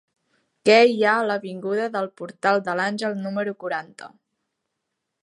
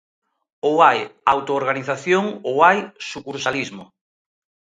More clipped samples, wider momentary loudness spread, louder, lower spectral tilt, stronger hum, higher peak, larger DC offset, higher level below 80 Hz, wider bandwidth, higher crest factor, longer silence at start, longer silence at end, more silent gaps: neither; about the same, 14 LU vs 14 LU; second, -22 LUFS vs -19 LUFS; about the same, -5 dB/octave vs -4.5 dB/octave; neither; about the same, -2 dBFS vs 0 dBFS; neither; second, -80 dBFS vs -64 dBFS; first, 11 kHz vs 9.4 kHz; about the same, 20 dB vs 20 dB; about the same, 0.65 s vs 0.65 s; first, 1.15 s vs 0.85 s; neither